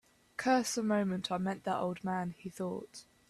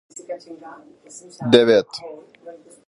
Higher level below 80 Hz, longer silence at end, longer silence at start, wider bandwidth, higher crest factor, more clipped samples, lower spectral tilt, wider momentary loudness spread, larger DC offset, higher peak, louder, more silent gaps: second, -72 dBFS vs -64 dBFS; about the same, 0.25 s vs 0.35 s; about the same, 0.4 s vs 0.3 s; first, 13.5 kHz vs 11 kHz; about the same, 18 dB vs 22 dB; neither; about the same, -5 dB/octave vs -5 dB/octave; second, 12 LU vs 27 LU; neither; second, -18 dBFS vs 0 dBFS; second, -35 LUFS vs -16 LUFS; neither